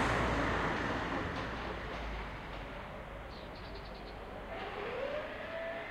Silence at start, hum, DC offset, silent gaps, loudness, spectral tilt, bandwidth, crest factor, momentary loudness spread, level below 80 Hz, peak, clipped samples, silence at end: 0 s; none; under 0.1%; none; -39 LUFS; -5.5 dB/octave; 15 kHz; 18 dB; 13 LU; -48 dBFS; -20 dBFS; under 0.1%; 0 s